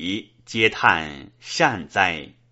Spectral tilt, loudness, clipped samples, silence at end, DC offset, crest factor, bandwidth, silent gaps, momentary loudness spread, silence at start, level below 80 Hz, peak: -1.5 dB/octave; -21 LUFS; under 0.1%; 0.2 s; under 0.1%; 22 dB; 8 kHz; none; 15 LU; 0 s; -54 dBFS; 0 dBFS